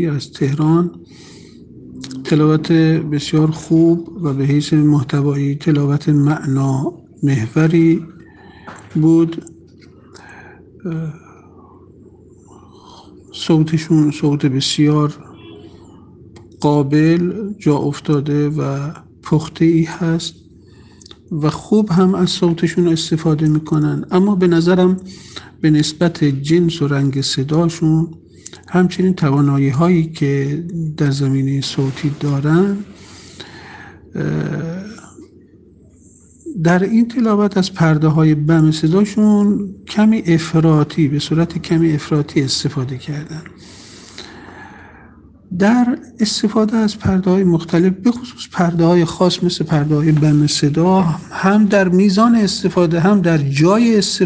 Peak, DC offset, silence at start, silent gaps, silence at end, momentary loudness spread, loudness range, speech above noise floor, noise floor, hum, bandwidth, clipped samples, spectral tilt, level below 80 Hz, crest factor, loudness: 0 dBFS; under 0.1%; 0 s; none; 0 s; 13 LU; 7 LU; 32 dB; -46 dBFS; none; 9.4 kHz; under 0.1%; -6.5 dB/octave; -48 dBFS; 16 dB; -15 LUFS